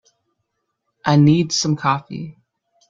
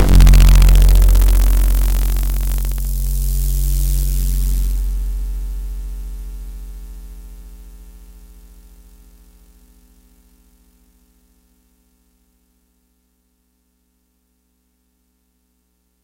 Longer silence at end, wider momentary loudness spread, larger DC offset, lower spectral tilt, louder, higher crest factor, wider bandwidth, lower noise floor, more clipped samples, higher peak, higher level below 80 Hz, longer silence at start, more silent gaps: second, 0.6 s vs 8.3 s; second, 19 LU vs 25 LU; neither; about the same, -5.5 dB/octave vs -5 dB/octave; about the same, -17 LUFS vs -17 LUFS; about the same, 18 dB vs 14 dB; second, 7.6 kHz vs 17.5 kHz; first, -74 dBFS vs -64 dBFS; neither; about the same, -2 dBFS vs -2 dBFS; second, -58 dBFS vs -16 dBFS; first, 1.05 s vs 0 s; neither